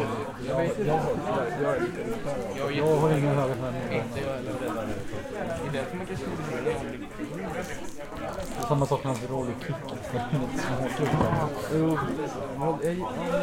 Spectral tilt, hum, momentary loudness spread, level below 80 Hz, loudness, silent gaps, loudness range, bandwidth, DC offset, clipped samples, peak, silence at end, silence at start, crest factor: -6.5 dB/octave; none; 9 LU; -48 dBFS; -29 LUFS; none; 6 LU; 16.5 kHz; under 0.1%; under 0.1%; -10 dBFS; 0 s; 0 s; 18 dB